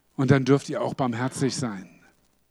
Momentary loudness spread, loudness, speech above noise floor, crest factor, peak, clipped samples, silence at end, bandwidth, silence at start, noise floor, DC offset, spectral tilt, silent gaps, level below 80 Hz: 11 LU; -24 LUFS; 37 dB; 22 dB; -4 dBFS; under 0.1%; 0.65 s; 12 kHz; 0.2 s; -61 dBFS; under 0.1%; -6 dB/octave; none; -64 dBFS